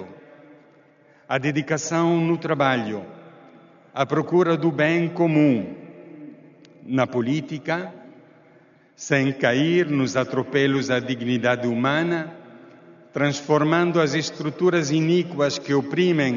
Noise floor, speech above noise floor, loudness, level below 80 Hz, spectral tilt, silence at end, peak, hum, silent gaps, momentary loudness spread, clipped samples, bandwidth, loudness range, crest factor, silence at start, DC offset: -55 dBFS; 34 dB; -22 LUFS; -68 dBFS; -5 dB/octave; 0 s; -4 dBFS; none; none; 15 LU; under 0.1%; 7.4 kHz; 3 LU; 18 dB; 0 s; under 0.1%